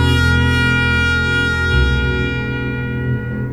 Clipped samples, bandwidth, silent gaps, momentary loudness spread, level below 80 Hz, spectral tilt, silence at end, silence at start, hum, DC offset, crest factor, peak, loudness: under 0.1%; 13.5 kHz; none; 7 LU; -24 dBFS; -6 dB/octave; 0 s; 0 s; none; under 0.1%; 14 dB; -2 dBFS; -16 LUFS